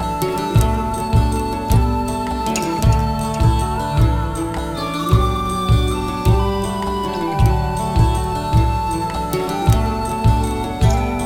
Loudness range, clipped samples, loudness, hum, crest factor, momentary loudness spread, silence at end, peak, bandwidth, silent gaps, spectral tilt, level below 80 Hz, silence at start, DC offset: 1 LU; under 0.1%; -18 LUFS; none; 16 dB; 5 LU; 0 s; -2 dBFS; 16 kHz; none; -6.5 dB/octave; -22 dBFS; 0 s; under 0.1%